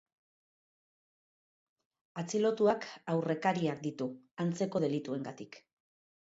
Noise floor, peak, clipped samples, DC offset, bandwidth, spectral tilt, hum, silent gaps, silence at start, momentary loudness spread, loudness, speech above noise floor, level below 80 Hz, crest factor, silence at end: under -90 dBFS; -16 dBFS; under 0.1%; under 0.1%; 8 kHz; -6 dB/octave; none; 4.31-4.37 s; 2.15 s; 13 LU; -34 LUFS; over 57 dB; -80 dBFS; 20 dB; 0.6 s